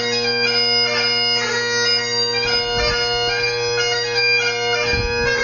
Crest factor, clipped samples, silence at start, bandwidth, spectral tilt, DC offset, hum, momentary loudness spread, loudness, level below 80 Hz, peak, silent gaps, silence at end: 12 dB; under 0.1%; 0 s; 7.2 kHz; -2 dB/octave; under 0.1%; none; 3 LU; -17 LUFS; -38 dBFS; -6 dBFS; none; 0 s